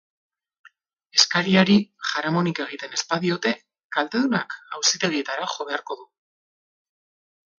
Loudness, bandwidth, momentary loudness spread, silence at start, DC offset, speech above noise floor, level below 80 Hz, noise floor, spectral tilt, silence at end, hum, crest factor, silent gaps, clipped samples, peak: -22 LUFS; 7.4 kHz; 12 LU; 1.15 s; under 0.1%; 33 dB; -68 dBFS; -56 dBFS; -3.5 dB/octave; 1.55 s; none; 24 dB; 3.84-3.90 s; under 0.1%; -2 dBFS